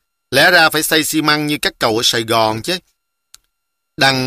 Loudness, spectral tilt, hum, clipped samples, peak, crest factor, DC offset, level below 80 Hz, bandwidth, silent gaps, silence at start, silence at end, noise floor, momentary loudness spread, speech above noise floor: -14 LUFS; -2.5 dB/octave; none; under 0.1%; 0 dBFS; 16 dB; under 0.1%; -50 dBFS; 15.5 kHz; none; 0.3 s; 0 s; -75 dBFS; 9 LU; 60 dB